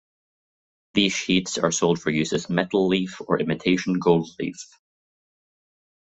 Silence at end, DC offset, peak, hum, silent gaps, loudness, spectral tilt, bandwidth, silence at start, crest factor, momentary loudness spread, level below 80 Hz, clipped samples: 1.35 s; under 0.1%; -4 dBFS; none; none; -23 LUFS; -4.5 dB/octave; 8.2 kHz; 0.95 s; 20 dB; 10 LU; -58 dBFS; under 0.1%